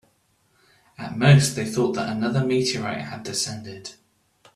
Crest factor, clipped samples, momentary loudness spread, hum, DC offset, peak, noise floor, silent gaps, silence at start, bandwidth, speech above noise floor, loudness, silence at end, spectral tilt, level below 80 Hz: 20 dB; under 0.1%; 21 LU; none; under 0.1%; -2 dBFS; -65 dBFS; none; 1 s; 13 kHz; 43 dB; -22 LUFS; 0.65 s; -5 dB/octave; -58 dBFS